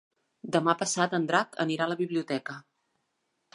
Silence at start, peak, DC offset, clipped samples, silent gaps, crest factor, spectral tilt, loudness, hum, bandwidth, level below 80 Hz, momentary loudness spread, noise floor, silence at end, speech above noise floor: 0.45 s; -8 dBFS; under 0.1%; under 0.1%; none; 22 dB; -4 dB/octave; -28 LUFS; none; 11.5 kHz; -80 dBFS; 12 LU; -78 dBFS; 0.95 s; 50 dB